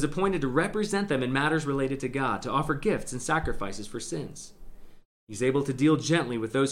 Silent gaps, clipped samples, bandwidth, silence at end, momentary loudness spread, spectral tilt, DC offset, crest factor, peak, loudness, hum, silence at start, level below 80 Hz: 5.05-5.27 s; under 0.1%; 15.5 kHz; 0 s; 11 LU; -5.5 dB/octave; under 0.1%; 18 dB; -10 dBFS; -28 LUFS; none; 0 s; -46 dBFS